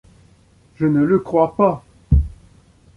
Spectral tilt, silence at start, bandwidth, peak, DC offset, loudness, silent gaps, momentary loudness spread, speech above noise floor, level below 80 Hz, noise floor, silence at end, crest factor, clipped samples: -10.5 dB/octave; 0.8 s; 5 kHz; -2 dBFS; under 0.1%; -18 LUFS; none; 9 LU; 36 dB; -26 dBFS; -52 dBFS; 0.7 s; 16 dB; under 0.1%